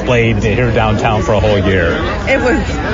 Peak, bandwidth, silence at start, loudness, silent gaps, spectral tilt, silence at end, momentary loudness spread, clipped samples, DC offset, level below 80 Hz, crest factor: 0 dBFS; 7.6 kHz; 0 s; -13 LUFS; none; -6.5 dB/octave; 0 s; 3 LU; under 0.1%; under 0.1%; -24 dBFS; 12 dB